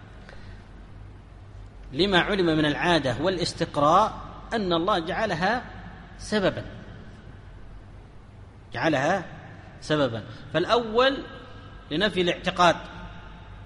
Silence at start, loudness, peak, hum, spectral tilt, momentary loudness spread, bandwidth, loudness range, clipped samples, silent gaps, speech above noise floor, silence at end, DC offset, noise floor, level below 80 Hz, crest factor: 0 s; -24 LUFS; -6 dBFS; none; -5 dB/octave; 24 LU; 11.5 kHz; 7 LU; under 0.1%; none; 22 dB; 0 s; under 0.1%; -46 dBFS; -46 dBFS; 20 dB